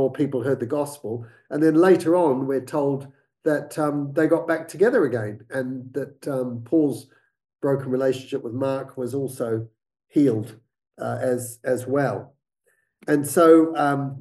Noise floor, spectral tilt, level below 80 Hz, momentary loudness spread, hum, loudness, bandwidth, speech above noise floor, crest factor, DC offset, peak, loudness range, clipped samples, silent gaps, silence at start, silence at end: -69 dBFS; -7 dB/octave; -72 dBFS; 14 LU; none; -23 LUFS; 12.5 kHz; 47 dB; 20 dB; under 0.1%; -4 dBFS; 5 LU; under 0.1%; none; 0 s; 0 s